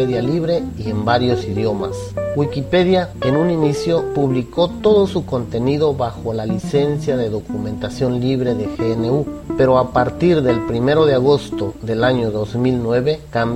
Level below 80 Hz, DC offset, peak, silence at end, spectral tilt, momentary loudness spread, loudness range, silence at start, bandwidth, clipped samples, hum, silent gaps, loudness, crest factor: -40 dBFS; under 0.1%; 0 dBFS; 0 s; -7.5 dB/octave; 8 LU; 3 LU; 0 s; 14.5 kHz; under 0.1%; none; none; -18 LUFS; 16 dB